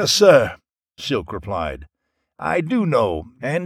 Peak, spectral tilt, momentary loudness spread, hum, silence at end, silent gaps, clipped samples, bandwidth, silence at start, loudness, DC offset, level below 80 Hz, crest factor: 0 dBFS; -4.5 dB/octave; 16 LU; none; 0 s; none; under 0.1%; 16 kHz; 0 s; -19 LUFS; under 0.1%; -44 dBFS; 20 dB